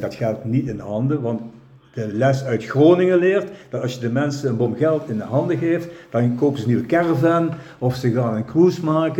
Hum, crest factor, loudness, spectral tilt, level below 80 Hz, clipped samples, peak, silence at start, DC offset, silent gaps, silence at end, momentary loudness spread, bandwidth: none; 16 dB; -20 LUFS; -8 dB/octave; -56 dBFS; under 0.1%; -2 dBFS; 0 s; under 0.1%; none; 0 s; 10 LU; 13.5 kHz